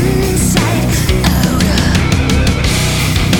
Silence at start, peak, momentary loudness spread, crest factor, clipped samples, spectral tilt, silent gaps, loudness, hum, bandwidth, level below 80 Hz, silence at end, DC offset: 0 s; 0 dBFS; 1 LU; 12 dB; under 0.1%; -4.5 dB/octave; none; -12 LUFS; none; 20 kHz; -18 dBFS; 0 s; under 0.1%